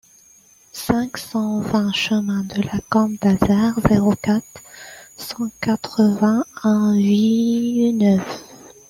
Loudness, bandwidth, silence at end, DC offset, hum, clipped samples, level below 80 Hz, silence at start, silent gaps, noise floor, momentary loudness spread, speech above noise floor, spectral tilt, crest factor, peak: -19 LUFS; 15.5 kHz; 0.2 s; under 0.1%; none; under 0.1%; -46 dBFS; 0.75 s; none; -51 dBFS; 16 LU; 33 dB; -6 dB/octave; 16 dB; -2 dBFS